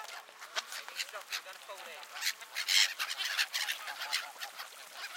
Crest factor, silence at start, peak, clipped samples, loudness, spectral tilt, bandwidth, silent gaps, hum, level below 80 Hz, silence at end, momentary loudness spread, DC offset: 26 dB; 0 s; -12 dBFS; under 0.1%; -34 LUFS; 4.5 dB/octave; 17 kHz; none; none; under -90 dBFS; 0 s; 18 LU; under 0.1%